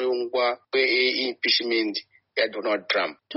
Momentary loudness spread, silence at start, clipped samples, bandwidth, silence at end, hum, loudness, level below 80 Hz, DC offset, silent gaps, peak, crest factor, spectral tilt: 7 LU; 0 s; under 0.1%; 6 kHz; 0 s; none; -24 LUFS; -78 dBFS; under 0.1%; none; -6 dBFS; 18 dB; 1.5 dB/octave